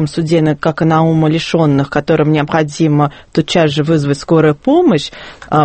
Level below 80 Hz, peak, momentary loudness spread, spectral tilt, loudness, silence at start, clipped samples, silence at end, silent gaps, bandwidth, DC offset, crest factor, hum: -44 dBFS; 0 dBFS; 5 LU; -7 dB/octave; -13 LUFS; 0 s; under 0.1%; 0 s; none; 8.8 kHz; under 0.1%; 12 dB; none